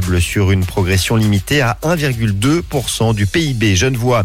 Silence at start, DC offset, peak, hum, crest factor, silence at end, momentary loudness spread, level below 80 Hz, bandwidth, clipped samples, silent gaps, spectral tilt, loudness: 0 s; under 0.1%; -2 dBFS; none; 12 dB; 0 s; 3 LU; -32 dBFS; 16.5 kHz; under 0.1%; none; -5 dB/octave; -15 LUFS